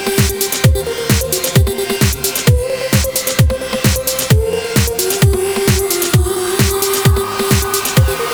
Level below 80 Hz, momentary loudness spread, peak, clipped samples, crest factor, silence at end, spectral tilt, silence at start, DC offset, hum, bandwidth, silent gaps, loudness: -22 dBFS; 2 LU; 0 dBFS; under 0.1%; 14 dB; 0 s; -4 dB/octave; 0 s; under 0.1%; none; over 20 kHz; none; -14 LUFS